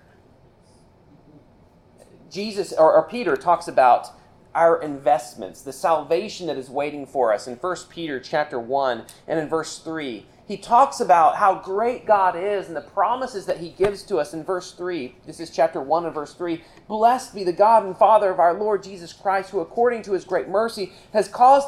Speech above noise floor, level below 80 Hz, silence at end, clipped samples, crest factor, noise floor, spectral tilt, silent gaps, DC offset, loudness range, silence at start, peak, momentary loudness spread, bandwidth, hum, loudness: 33 dB; -58 dBFS; 0 s; under 0.1%; 18 dB; -54 dBFS; -4.5 dB/octave; none; under 0.1%; 6 LU; 2.3 s; -4 dBFS; 14 LU; 13.5 kHz; none; -21 LUFS